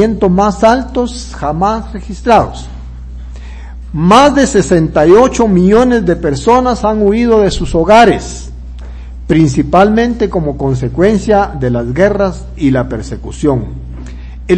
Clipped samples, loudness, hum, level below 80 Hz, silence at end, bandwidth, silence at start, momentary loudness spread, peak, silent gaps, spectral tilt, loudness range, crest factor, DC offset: 2%; -10 LUFS; none; -26 dBFS; 0 s; 11 kHz; 0 s; 22 LU; 0 dBFS; none; -6.5 dB/octave; 5 LU; 10 dB; under 0.1%